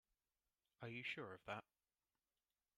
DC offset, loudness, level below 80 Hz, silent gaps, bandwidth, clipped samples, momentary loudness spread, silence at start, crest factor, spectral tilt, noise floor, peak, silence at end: under 0.1%; -52 LUFS; -90 dBFS; none; 13 kHz; under 0.1%; 5 LU; 0.8 s; 22 dB; -5.5 dB/octave; under -90 dBFS; -36 dBFS; 1.15 s